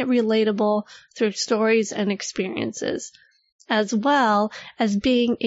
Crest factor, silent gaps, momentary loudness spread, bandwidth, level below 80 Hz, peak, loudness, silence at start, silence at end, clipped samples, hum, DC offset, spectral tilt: 14 dB; 3.52-3.59 s; 9 LU; 8 kHz; -58 dBFS; -8 dBFS; -22 LUFS; 0 s; 0 s; under 0.1%; none; under 0.1%; -4.5 dB/octave